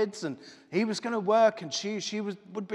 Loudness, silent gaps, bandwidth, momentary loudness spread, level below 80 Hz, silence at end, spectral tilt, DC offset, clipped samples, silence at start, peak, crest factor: -29 LUFS; none; 11 kHz; 14 LU; -84 dBFS; 0 s; -4.5 dB/octave; under 0.1%; under 0.1%; 0 s; -10 dBFS; 18 dB